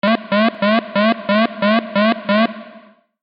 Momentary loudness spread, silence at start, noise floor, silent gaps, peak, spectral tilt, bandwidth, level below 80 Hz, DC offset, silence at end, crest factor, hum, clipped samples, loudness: 2 LU; 0.05 s; -45 dBFS; none; -2 dBFS; -3.5 dB/octave; 5.4 kHz; -70 dBFS; under 0.1%; 0.45 s; 14 dB; none; under 0.1%; -16 LUFS